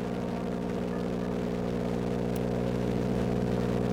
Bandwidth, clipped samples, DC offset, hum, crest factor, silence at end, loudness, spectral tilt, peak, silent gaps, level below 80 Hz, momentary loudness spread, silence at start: 19 kHz; under 0.1%; under 0.1%; 60 Hz at -35 dBFS; 12 dB; 0 s; -31 LUFS; -7.5 dB/octave; -18 dBFS; none; -44 dBFS; 4 LU; 0 s